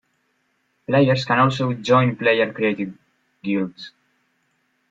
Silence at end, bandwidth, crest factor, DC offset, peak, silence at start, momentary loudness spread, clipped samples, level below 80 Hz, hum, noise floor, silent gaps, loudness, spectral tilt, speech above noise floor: 1 s; 7.8 kHz; 18 dB; under 0.1%; -2 dBFS; 0.9 s; 15 LU; under 0.1%; -62 dBFS; none; -68 dBFS; none; -20 LUFS; -7 dB/octave; 49 dB